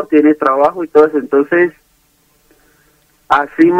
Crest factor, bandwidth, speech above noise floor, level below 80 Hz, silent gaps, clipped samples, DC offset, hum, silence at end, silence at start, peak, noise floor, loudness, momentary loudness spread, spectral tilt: 14 dB; 8.2 kHz; 44 dB; -56 dBFS; none; under 0.1%; under 0.1%; none; 0 s; 0 s; 0 dBFS; -55 dBFS; -12 LUFS; 4 LU; -7 dB/octave